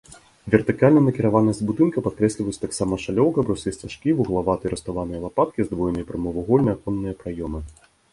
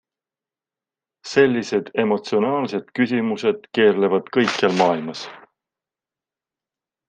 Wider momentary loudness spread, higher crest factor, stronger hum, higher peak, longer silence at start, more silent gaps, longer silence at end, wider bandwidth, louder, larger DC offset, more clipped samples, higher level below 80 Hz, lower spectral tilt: first, 12 LU vs 9 LU; about the same, 22 dB vs 20 dB; neither; about the same, 0 dBFS vs -2 dBFS; second, 0.1 s vs 1.25 s; neither; second, 0.4 s vs 1.7 s; first, 11.5 kHz vs 9.2 kHz; about the same, -22 LUFS vs -20 LUFS; neither; neither; first, -44 dBFS vs -70 dBFS; first, -7 dB/octave vs -5.5 dB/octave